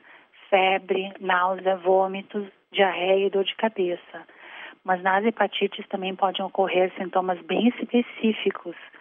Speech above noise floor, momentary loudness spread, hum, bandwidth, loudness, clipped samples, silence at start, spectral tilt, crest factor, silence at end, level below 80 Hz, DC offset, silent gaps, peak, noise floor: 28 dB; 13 LU; none; 3.8 kHz; -24 LUFS; under 0.1%; 0.5 s; -8 dB/octave; 18 dB; 0.05 s; -84 dBFS; under 0.1%; none; -6 dBFS; -52 dBFS